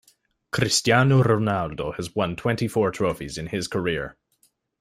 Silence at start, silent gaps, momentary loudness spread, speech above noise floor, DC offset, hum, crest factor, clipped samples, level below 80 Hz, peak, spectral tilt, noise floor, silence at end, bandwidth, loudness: 0.55 s; none; 12 LU; 43 dB; under 0.1%; none; 18 dB; under 0.1%; -52 dBFS; -4 dBFS; -5 dB/octave; -66 dBFS; 0.7 s; 15.5 kHz; -23 LUFS